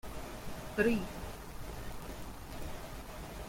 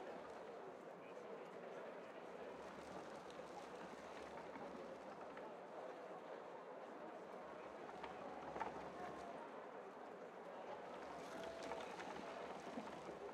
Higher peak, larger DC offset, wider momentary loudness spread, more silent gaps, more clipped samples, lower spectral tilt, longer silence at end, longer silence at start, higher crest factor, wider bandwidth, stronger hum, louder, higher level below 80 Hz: first, -18 dBFS vs -32 dBFS; neither; first, 15 LU vs 5 LU; neither; neither; about the same, -5.5 dB/octave vs -4.5 dB/octave; about the same, 0 s vs 0 s; about the same, 0.05 s vs 0 s; about the same, 22 dB vs 22 dB; first, 16.5 kHz vs 14.5 kHz; neither; first, -40 LUFS vs -53 LUFS; first, -48 dBFS vs -82 dBFS